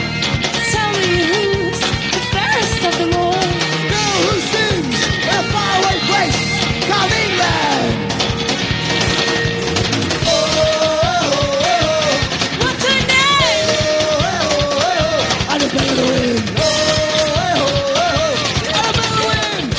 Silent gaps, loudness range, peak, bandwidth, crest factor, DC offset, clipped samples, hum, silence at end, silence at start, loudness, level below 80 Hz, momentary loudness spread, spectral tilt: none; 2 LU; 0 dBFS; 8 kHz; 14 dB; under 0.1%; under 0.1%; none; 0 s; 0 s; -15 LUFS; -34 dBFS; 3 LU; -3.5 dB/octave